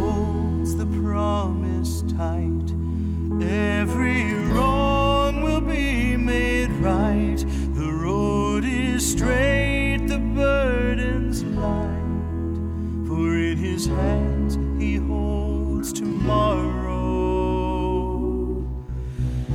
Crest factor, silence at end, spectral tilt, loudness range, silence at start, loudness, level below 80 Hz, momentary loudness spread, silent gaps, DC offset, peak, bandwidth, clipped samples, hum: 16 dB; 0 s; -6 dB/octave; 3 LU; 0 s; -23 LUFS; -28 dBFS; 6 LU; none; under 0.1%; -6 dBFS; 16 kHz; under 0.1%; none